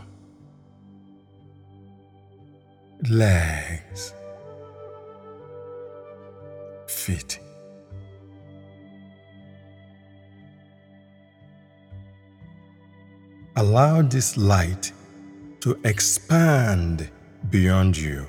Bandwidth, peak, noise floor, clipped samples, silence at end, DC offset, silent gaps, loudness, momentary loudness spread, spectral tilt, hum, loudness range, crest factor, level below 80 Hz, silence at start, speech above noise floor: 18 kHz; -4 dBFS; -52 dBFS; under 0.1%; 0 s; under 0.1%; none; -22 LUFS; 26 LU; -5 dB/octave; none; 15 LU; 22 dB; -44 dBFS; 0 s; 32 dB